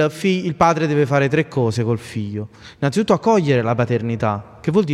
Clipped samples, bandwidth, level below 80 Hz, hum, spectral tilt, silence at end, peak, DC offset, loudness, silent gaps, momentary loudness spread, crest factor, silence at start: under 0.1%; 13 kHz; -50 dBFS; none; -7 dB/octave; 0 s; -2 dBFS; under 0.1%; -19 LUFS; none; 10 LU; 16 dB; 0 s